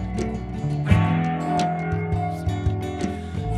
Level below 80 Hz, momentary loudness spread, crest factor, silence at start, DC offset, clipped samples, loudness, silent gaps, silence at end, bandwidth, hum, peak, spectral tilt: -36 dBFS; 9 LU; 20 dB; 0 s; under 0.1%; under 0.1%; -24 LUFS; none; 0 s; 11.5 kHz; none; -4 dBFS; -7.5 dB/octave